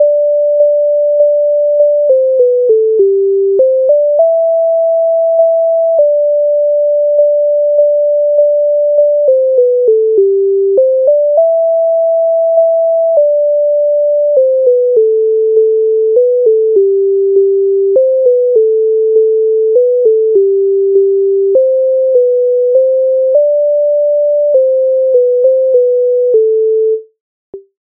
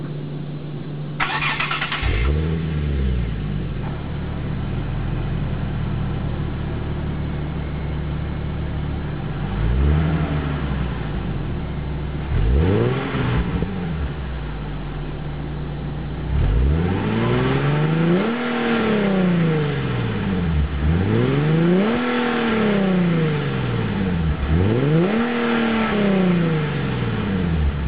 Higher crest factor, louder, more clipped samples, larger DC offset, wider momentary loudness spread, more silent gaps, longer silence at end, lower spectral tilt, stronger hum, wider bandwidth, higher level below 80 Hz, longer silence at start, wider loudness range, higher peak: second, 8 dB vs 14 dB; first, -10 LUFS vs -22 LUFS; neither; second, under 0.1% vs 1%; second, 2 LU vs 10 LU; first, 27.21-27.53 s vs none; first, 0.25 s vs 0 s; second, -5.5 dB/octave vs -12 dB/octave; neither; second, 1 kHz vs 4.9 kHz; second, -72 dBFS vs -28 dBFS; about the same, 0 s vs 0 s; second, 1 LU vs 6 LU; first, 0 dBFS vs -6 dBFS